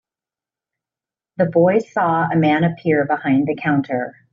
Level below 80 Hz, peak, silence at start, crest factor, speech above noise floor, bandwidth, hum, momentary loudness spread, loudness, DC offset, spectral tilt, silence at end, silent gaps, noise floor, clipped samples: -62 dBFS; -4 dBFS; 1.4 s; 16 dB; 72 dB; 7.2 kHz; none; 7 LU; -18 LUFS; under 0.1%; -6.5 dB/octave; 0.25 s; none; -90 dBFS; under 0.1%